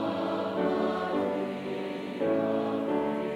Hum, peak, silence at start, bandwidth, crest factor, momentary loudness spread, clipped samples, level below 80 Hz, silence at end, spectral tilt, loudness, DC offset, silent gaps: none; -16 dBFS; 0 s; 13 kHz; 14 dB; 6 LU; under 0.1%; -68 dBFS; 0 s; -7 dB/octave; -30 LUFS; under 0.1%; none